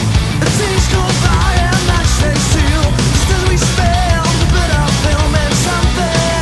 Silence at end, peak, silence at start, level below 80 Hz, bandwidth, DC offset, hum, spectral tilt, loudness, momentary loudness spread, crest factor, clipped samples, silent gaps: 0 s; 0 dBFS; 0 s; -18 dBFS; 12 kHz; under 0.1%; none; -4.5 dB/octave; -13 LUFS; 1 LU; 12 dB; under 0.1%; none